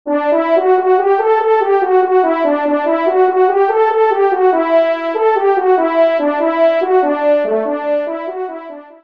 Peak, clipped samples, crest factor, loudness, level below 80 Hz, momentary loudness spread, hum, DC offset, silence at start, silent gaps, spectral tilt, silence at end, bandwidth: -2 dBFS; under 0.1%; 12 dB; -13 LUFS; -68 dBFS; 6 LU; none; 0.3%; 0.05 s; none; -6 dB/octave; 0.2 s; 5.2 kHz